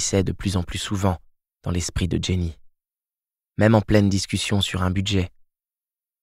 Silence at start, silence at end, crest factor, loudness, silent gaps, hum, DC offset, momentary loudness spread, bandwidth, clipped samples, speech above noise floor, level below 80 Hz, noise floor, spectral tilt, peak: 0 s; 0.95 s; 20 dB; -23 LUFS; none; none; under 0.1%; 12 LU; 14.5 kHz; under 0.1%; over 69 dB; -40 dBFS; under -90 dBFS; -5 dB/octave; -4 dBFS